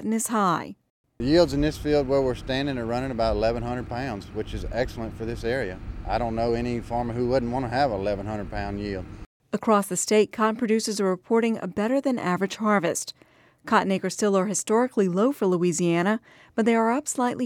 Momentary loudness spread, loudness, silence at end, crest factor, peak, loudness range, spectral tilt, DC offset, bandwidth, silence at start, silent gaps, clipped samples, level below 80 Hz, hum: 10 LU; -25 LUFS; 0 s; 20 dB; -6 dBFS; 5 LU; -5 dB/octave; under 0.1%; 16.5 kHz; 0 s; 0.90-1.04 s, 9.26-9.40 s; under 0.1%; -42 dBFS; none